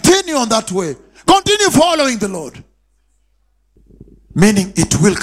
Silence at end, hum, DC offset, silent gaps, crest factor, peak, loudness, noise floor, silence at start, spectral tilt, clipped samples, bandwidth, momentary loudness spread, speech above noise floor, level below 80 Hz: 0 s; none; under 0.1%; none; 14 dB; 0 dBFS; -14 LUFS; -60 dBFS; 0.05 s; -4 dB/octave; under 0.1%; 16 kHz; 13 LU; 46 dB; -38 dBFS